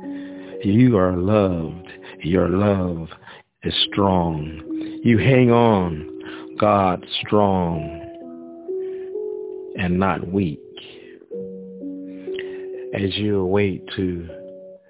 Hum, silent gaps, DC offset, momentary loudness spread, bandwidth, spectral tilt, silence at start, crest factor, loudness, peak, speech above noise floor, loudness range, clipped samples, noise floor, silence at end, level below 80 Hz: none; none; under 0.1%; 20 LU; 4 kHz; -11 dB/octave; 0 s; 18 dB; -21 LUFS; -2 dBFS; 23 dB; 8 LU; under 0.1%; -42 dBFS; 0.1 s; -42 dBFS